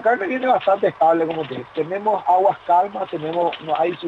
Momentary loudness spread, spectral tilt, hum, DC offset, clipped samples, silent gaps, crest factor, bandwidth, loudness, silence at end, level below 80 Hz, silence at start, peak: 9 LU; -7 dB/octave; none; under 0.1%; under 0.1%; none; 14 dB; 7.8 kHz; -20 LUFS; 0 s; -66 dBFS; 0 s; -6 dBFS